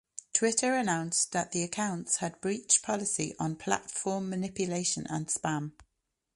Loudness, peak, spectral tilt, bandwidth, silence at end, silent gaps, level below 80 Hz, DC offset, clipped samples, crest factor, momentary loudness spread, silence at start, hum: -30 LUFS; -10 dBFS; -3 dB/octave; 11.5 kHz; 0.55 s; none; -68 dBFS; under 0.1%; under 0.1%; 22 dB; 8 LU; 0.15 s; none